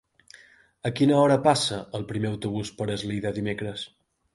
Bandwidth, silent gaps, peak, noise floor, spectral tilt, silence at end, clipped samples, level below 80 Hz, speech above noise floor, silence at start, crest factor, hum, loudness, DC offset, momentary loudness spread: 11.5 kHz; none; -6 dBFS; -54 dBFS; -5.5 dB/octave; 0.5 s; under 0.1%; -58 dBFS; 29 dB; 0.85 s; 20 dB; none; -25 LUFS; under 0.1%; 14 LU